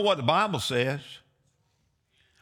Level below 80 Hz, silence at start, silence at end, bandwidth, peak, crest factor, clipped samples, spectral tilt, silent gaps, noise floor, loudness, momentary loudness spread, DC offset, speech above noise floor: -68 dBFS; 0 s; 1.25 s; 18 kHz; -8 dBFS; 20 dB; under 0.1%; -4.5 dB/octave; none; -72 dBFS; -26 LUFS; 13 LU; under 0.1%; 46 dB